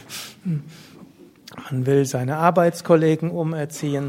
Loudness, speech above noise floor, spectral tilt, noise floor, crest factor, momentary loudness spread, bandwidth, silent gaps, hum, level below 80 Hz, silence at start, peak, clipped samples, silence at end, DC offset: -21 LUFS; 27 dB; -6.5 dB/octave; -47 dBFS; 20 dB; 13 LU; 16.5 kHz; none; none; -62 dBFS; 0.1 s; 0 dBFS; under 0.1%; 0 s; under 0.1%